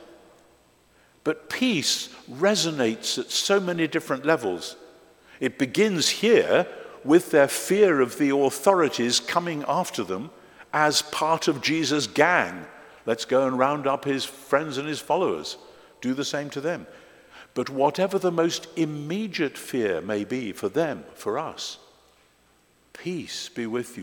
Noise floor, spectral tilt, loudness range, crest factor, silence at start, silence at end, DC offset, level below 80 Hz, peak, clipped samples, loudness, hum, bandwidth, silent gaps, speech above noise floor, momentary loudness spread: -62 dBFS; -3.5 dB/octave; 8 LU; 22 dB; 1.25 s; 0 s; under 0.1%; -68 dBFS; -2 dBFS; under 0.1%; -24 LUFS; none; 18 kHz; none; 37 dB; 13 LU